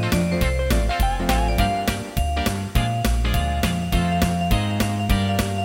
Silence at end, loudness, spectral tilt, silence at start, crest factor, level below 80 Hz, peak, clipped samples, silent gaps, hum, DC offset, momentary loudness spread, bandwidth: 0 s; -22 LUFS; -5.5 dB/octave; 0 s; 16 dB; -24 dBFS; -4 dBFS; under 0.1%; none; none; under 0.1%; 3 LU; 17 kHz